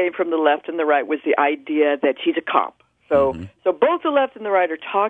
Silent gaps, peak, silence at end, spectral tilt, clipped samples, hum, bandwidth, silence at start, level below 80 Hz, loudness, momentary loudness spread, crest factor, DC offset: none; 0 dBFS; 0 s; -7.5 dB/octave; under 0.1%; none; 3.9 kHz; 0 s; -56 dBFS; -20 LUFS; 4 LU; 20 dB; under 0.1%